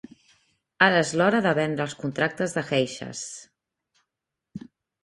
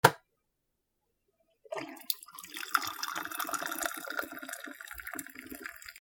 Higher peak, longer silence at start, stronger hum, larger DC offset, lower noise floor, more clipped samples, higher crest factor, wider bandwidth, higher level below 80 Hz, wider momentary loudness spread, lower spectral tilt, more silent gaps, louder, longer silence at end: about the same, -2 dBFS vs -2 dBFS; first, 0.8 s vs 0.05 s; neither; neither; about the same, -85 dBFS vs -82 dBFS; neither; second, 24 dB vs 34 dB; second, 11.5 kHz vs over 20 kHz; about the same, -66 dBFS vs -70 dBFS; first, 23 LU vs 12 LU; first, -4.5 dB/octave vs -2.5 dB/octave; neither; first, -24 LUFS vs -36 LUFS; first, 0.45 s vs 0 s